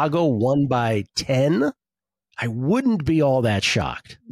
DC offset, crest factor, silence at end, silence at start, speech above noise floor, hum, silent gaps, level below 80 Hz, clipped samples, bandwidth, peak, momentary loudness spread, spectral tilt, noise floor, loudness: under 0.1%; 12 dB; 0 s; 0 s; over 70 dB; none; none; -48 dBFS; under 0.1%; 15 kHz; -10 dBFS; 9 LU; -6 dB/octave; under -90 dBFS; -21 LUFS